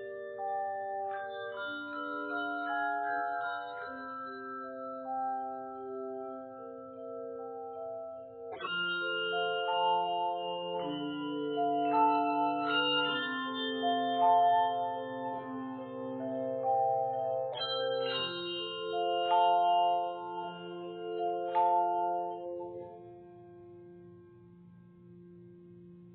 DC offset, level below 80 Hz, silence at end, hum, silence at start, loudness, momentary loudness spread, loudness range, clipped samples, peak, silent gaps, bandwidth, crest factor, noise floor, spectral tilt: under 0.1%; -82 dBFS; 0 s; none; 0 s; -33 LUFS; 15 LU; 10 LU; under 0.1%; -16 dBFS; none; 4.5 kHz; 18 dB; -56 dBFS; -1.5 dB/octave